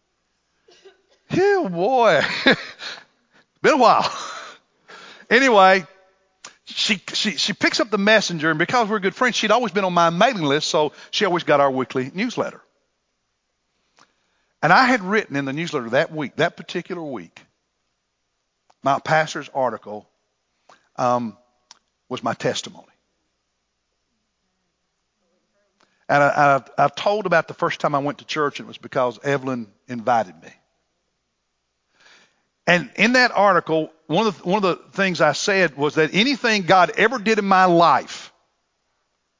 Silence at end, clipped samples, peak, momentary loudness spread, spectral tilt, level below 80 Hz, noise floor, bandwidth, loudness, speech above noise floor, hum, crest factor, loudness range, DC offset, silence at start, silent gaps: 1.15 s; under 0.1%; 0 dBFS; 14 LU; -4 dB/octave; -68 dBFS; -74 dBFS; 7.6 kHz; -19 LUFS; 55 dB; none; 22 dB; 10 LU; under 0.1%; 1.3 s; none